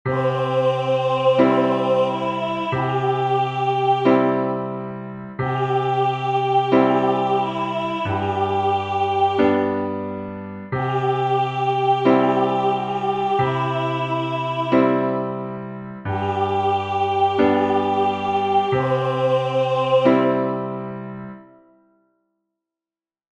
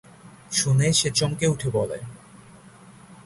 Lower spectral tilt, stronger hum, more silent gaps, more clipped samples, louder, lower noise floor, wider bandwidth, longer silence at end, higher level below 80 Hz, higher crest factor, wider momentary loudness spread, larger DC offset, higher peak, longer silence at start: first, -7.5 dB/octave vs -4 dB/octave; neither; neither; neither; about the same, -20 LUFS vs -22 LUFS; first, under -90 dBFS vs -48 dBFS; second, 8.2 kHz vs 11.5 kHz; first, 1.95 s vs 0.1 s; second, -58 dBFS vs -52 dBFS; about the same, 18 dB vs 18 dB; about the same, 11 LU vs 13 LU; neither; first, -2 dBFS vs -6 dBFS; second, 0.05 s vs 0.25 s